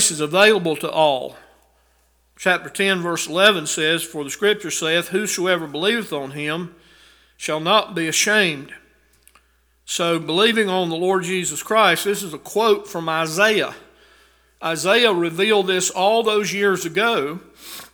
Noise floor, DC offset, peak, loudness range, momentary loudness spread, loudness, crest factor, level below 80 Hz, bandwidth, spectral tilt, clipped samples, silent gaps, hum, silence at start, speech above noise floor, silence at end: -60 dBFS; under 0.1%; 0 dBFS; 3 LU; 11 LU; -19 LUFS; 20 dB; -62 dBFS; over 20 kHz; -2.5 dB/octave; under 0.1%; none; none; 0 s; 41 dB; 0.1 s